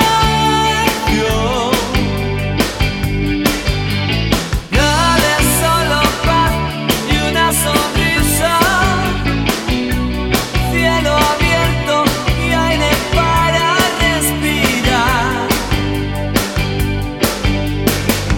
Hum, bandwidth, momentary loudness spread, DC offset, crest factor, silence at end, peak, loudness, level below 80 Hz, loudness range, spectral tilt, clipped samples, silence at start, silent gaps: none; 18.5 kHz; 5 LU; under 0.1%; 14 dB; 0 s; 0 dBFS; -14 LUFS; -24 dBFS; 3 LU; -4 dB/octave; under 0.1%; 0 s; none